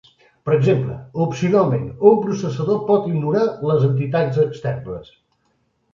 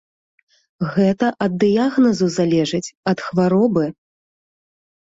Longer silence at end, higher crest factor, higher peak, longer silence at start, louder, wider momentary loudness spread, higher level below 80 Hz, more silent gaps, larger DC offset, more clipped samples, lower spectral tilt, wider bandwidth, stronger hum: second, 0.9 s vs 1.15 s; about the same, 18 dB vs 16 dB; first, 0 dBFS vs -4 dBFS; second, 0.45 s vs 0.8 s; about the same, -19 LUFS vs -18 LUFS; first, 11 LU vs 7 LU; first, -52 dBFS vs -58 dBFS; second, none vs 2.97-3.03 s; neither; neither; first, -8.5 dB/octave vs -6.5 dB/octave; about the same, 7.4 kHz vs 8 kHz; neither